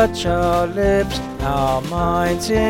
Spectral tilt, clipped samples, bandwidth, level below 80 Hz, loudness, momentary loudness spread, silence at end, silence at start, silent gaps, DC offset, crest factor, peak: -5.5 dB/octave; under 0.1%; 17 kHz; -30 dBFS; -19 LUFS; 4 LU; 0 s; 0 s; none; under 0.1%; 14 dB; -4 dBFS